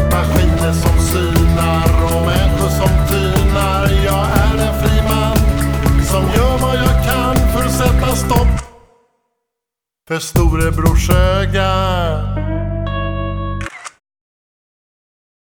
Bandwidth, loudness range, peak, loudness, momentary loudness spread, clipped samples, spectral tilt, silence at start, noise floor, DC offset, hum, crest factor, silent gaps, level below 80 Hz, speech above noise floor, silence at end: over 20 kHz; 4 LU; 0 dBFS; -15 LUFS; 7 LU; under 0.1%; -5.5 dB/octave; 0 s; -83 dBFS; under 0.1%; none; 14 dB; none; -18 dBFS; 70 dB; 1.6 s